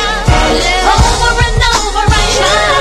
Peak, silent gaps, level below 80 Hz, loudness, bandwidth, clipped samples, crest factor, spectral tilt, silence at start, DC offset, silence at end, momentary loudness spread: 0 dBFS; none; -16 dBFS; -10 LUFS; 13.5 kHz; 0.4%; 10 dB; -3.5 dB/octave; 0 s; under 0.1%; 0 s; 2 LU